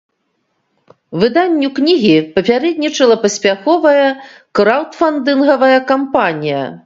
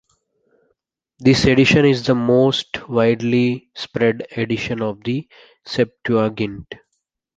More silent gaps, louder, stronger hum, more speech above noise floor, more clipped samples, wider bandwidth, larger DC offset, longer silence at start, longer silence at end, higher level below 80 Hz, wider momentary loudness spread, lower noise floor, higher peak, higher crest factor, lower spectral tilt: neither; first, -13 LUFS vs -18 LUFS; neither; about the same, 54 dB vs 57 dB; neither; second, 7.8 kHz vs 9.2 kHz; neither; about the same, 1.1 s vs 1.2 s; second, 0.05 s vs 0.6 s; second, -56 dBFS vs -46 dBFS; second, 6 LU vs 14 LU; second, -66 dBFS vs -75 dBFS; about the same, 0 dBFS vs -2 dBFS; about the same, 14 dB vs 18 dB; second, -4.5 dB/octave vs -6 dB/octave